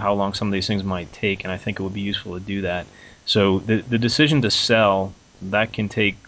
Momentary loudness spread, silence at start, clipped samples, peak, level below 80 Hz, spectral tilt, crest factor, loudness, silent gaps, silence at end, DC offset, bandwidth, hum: 11 LU; 0 s; under 0.1%; -4 dBFS; -46 dBFS; -5 dB/octave; 16 dB; -21 LUFS; none; 0.1 s; under 0.1%; 8 kHz; none